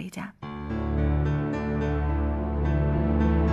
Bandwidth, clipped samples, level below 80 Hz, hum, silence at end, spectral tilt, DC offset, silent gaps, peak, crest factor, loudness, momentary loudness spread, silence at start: 8 kHz; under 0.1%; -30 dBFS; none; 0 s; -9 dB/octave; under 0.1%; none; -10 dBFS; 14 dB; -27 LUFS; 13 LU; 0 s